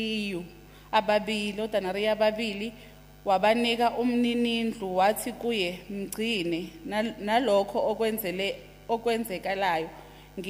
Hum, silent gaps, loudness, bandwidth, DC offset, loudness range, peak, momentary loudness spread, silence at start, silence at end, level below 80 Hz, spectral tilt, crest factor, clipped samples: 50 Hz at -55 dBFS; none; -28 LUFS; 15.5 kHz; under 0.1%; 2 LU; -8 dBFS; 12 LU; 0 s; 0 s; -56 dBFS; -4.5 dB/octave; 20 dB; under 0.1%